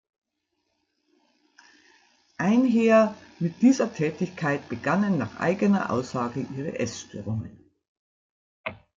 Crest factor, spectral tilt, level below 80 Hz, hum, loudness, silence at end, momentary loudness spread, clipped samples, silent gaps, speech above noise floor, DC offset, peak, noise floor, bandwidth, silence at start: 20 dB; -6.5 dB/octave; -66 dBFS; none; -25 LUFS; 0.2 s; 13 LU; under 0.1%; 7.88-8.64 s; 54 dB; under 0.1%; -8 dBFS; -78 dBFS; 7.6 kHz; 2.4 s